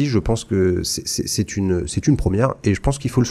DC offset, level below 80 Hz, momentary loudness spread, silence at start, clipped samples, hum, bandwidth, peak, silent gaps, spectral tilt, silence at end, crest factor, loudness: under 0.1%; -32 dBFS; 3 LU; 0 s; under 0.1%; none; 15 kHz; -4 dBFS; none; -5.5 dB/octave; 0 s; 16 dB; -20 LUFS